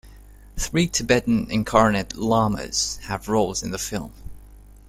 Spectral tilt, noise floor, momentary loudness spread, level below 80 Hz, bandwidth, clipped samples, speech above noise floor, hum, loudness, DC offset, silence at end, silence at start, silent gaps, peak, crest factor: -4 dB/octave; -45 dBFS; 12 LU; -40 dBFS; 16 kHz; under 0.1%; 23 dB; 50 Hz at -40 dBFS; -22 LUFS; under 0.1%; 0.25 s; 0.05 s; none; -2 dBFS; 22 dB